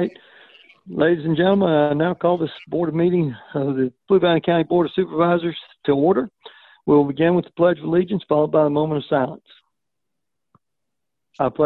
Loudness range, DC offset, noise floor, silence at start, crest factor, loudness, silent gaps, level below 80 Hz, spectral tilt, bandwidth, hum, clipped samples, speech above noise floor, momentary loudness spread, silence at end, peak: 3 LU; under 0.1%; -83 dBFS; 0 s; 16 dB; -20 LUFS; none; -58 dBFS; -10 dB/octave; 4.3 kHz; none; under 0.1%; 64 dB; 8 LU; 0 s; -4 dBFS